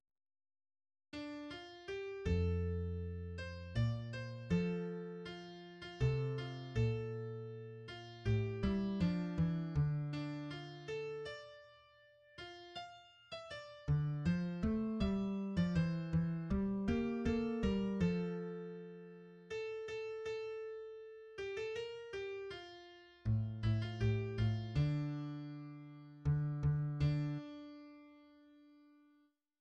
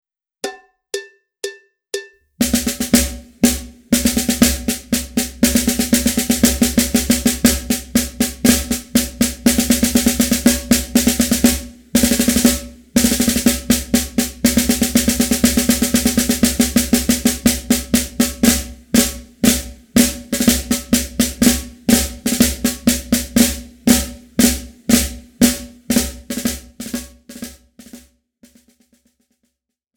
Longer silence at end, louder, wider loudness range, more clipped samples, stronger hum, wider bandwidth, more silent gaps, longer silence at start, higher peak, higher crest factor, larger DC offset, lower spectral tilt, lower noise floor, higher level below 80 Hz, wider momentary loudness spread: second, 0.8 s vs 1.95 s; second, -40 LUFS vs -16 LUFS; first, 8 LU vs 5 LU; neither; neither; second, 8.2 kHz vs over 20 kHz; neither; first, 1.15 s vs 0.45 s; second, -24 dBFS vs 0 dBFS; about the same, 16 dB vs 18 dB; neither; first, -8 dB/octave vs -3 dB/octave; about the same, -74 dBFS vs -74 dBFS; second, -54 dBFS vs -32 dBFS; first, 15 LU vs 12 LU